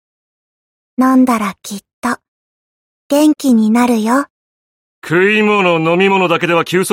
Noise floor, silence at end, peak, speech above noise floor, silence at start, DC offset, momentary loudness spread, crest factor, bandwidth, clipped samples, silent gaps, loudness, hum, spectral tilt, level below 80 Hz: under -90 dBFS; 0 s; -2 dBFS; over 78 dB; 1 s; under 0.1%; 14 LU; 12 dB; 16.5 kHz; under 0.1%; 1.93-2.02 s, 2.28-3.10 s, 4.30-5.02 s; -13 LUFS; none; -5 dB/octave; -60 dBFS